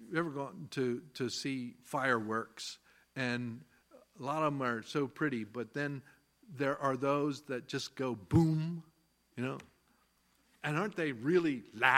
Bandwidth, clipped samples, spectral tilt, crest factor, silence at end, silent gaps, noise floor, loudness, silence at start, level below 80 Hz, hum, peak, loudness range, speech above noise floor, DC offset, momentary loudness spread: 15.5 kHz; under 0.1%; -6 dB/octave; 26 dB; 0 s; none; -72 dBFS; -36 LUFS; 0 s; -64 dBFS; none; -8 dBFS; 3 LU; 38 dB; under 0.1%; 13 LU